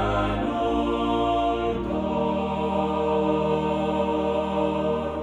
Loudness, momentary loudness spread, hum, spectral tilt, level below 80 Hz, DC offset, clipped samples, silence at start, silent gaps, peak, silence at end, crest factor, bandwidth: -25 LUFS; 3 LU; none; -7.5 dB/octave; -40 dBFS; under 0.1%; under 0.1%; 0 s; none; -10 dBFS; 0 s; 14 dB; 10.5 kHz